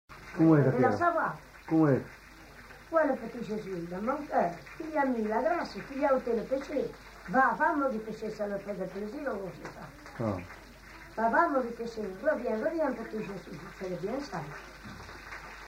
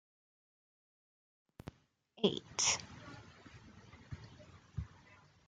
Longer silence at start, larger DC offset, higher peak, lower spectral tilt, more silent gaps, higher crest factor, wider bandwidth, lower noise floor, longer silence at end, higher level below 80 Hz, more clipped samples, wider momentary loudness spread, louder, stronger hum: second, 0.1 s vs 2.15 s; neither; first, -12 dBFS vs -16 dBFS; first, -7.5 dB/octave vs -2.5 dB/octave; neither; second, 20 dB vs 28 dB; first, 16 kHz vs 10.5 kHz; second, -51 dBFS vs -68 dBFS; second, 0 s vs 0.3 s; first, -58 dBFS vs -64 dBFS; neither; second, 19 LU vs 25 LU; first, -31 LUFS vs -36 LUFS; neither